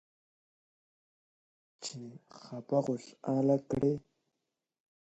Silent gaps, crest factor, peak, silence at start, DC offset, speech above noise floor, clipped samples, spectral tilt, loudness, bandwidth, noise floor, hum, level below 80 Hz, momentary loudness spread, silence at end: none; 20 dB; -16 dBFS; 1.8 s; under 0.1%; 54 dB; under 0.1%; -7 dB/octave; -33 LUFS; 8.2 kHz; -87 dBFS; none; -66 dBFS; 18 LU; 1.1 s